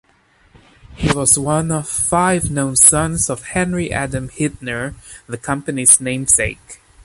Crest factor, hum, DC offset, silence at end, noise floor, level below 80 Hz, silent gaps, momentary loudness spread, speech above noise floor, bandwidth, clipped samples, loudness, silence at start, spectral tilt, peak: 18 dB; none; under 0.1%; 0.3 s; -55 dBFS; -38 dBFS; none; 15 LU; 37 dB; 16 kHz; under 0.1%; -15 LUFS; 0.9 s; -3.5 dB/octave; 0 dBFS